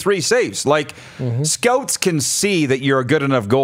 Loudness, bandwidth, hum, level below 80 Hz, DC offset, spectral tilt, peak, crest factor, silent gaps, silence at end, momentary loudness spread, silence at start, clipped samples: -17 LUFS; 16 kHz; none; -60 dBFS; under 0.1%; -4 dB/octave; 0 dBFS; 18 dB; none; 0 s; 4 LU; 0 s; under 0.1%